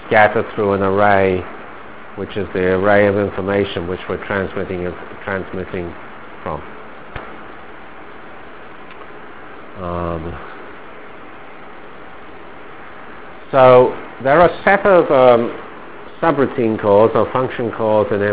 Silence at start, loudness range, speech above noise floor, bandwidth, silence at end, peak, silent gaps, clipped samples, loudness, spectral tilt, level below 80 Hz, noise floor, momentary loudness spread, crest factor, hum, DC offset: 0 s; 19 LU; 22 dB; 4 kHz; 0 s; 0 dBFS; none; 0.1%; -16 LUFS; -10 dB/octave; -42 dBFS; -37 dBFS; 25 LU; 18 dB; none; 2%